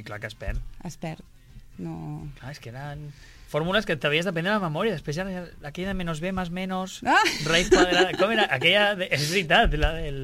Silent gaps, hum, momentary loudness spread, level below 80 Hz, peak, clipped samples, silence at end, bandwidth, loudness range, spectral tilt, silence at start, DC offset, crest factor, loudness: none; none; 19 LU; -38 dBFS; -8 dBFS; under 0.1%; 0 s; 16 kHz; 14 LU; -4 dB/octave; 0 s; under 0.1%; 18 dB; -23 LUFS